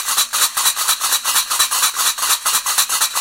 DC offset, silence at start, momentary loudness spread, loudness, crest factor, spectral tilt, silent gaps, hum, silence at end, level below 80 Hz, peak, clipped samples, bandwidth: under 0.1%; 0 s; 2 LU; -14 LUFS; 16 dB; 4 dB/octave; none; none; 0 s; -58 dBFS; 0 dBFS; under 0.1%; 17 kHz